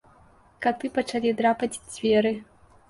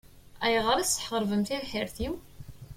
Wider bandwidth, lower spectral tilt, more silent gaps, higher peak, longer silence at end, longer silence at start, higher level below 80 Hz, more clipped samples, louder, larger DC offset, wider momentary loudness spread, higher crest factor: second, 11.5 kHz vs 16.5 kHz; first, -4.5 dB/octave vs -3 dB/octave; neither; first, -8 dBFS vs -12 dBFS; first, 0.45 s vs 0 s; first, 0.6 s vs 0.15 s; second, -60 dBFS vs -50 dBFS; neither; first, -25 LUFS vs -29 LUFS; neither; second, 7 LU vs 11 LU; about the same, 18 dB vs 18 dB